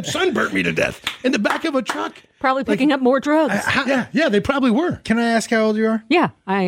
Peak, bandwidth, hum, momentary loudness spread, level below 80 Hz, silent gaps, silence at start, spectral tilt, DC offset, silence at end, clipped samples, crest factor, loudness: -4 dBFS; 16 kHz; none; 5 LU; -50 dBFS; none; 0 s; -5 dB/octave; under 0.1%; 0 s; under 0.1%; 14 dB; -19 LUFS